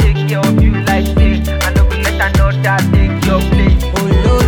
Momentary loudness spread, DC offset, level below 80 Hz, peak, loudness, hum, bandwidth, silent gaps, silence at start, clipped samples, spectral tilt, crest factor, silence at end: 2 LU; under 0.1%; -14 dBFS; 0 dBFS; -13 LUFS; none; 18 kHz; none; 0 s; under 0.1%; -6 dB/octave; 10 dB; 0 s